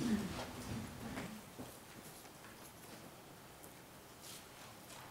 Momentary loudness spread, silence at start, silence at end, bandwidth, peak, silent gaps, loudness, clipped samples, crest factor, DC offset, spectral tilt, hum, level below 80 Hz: 10 LU; 0 s; 0 s; 16 kHz; -26 dBFS; none; -49 LUFS; under 0.1%; 22 dB; under 0.1%; -4.5 dB/octave; none; -66 dBFS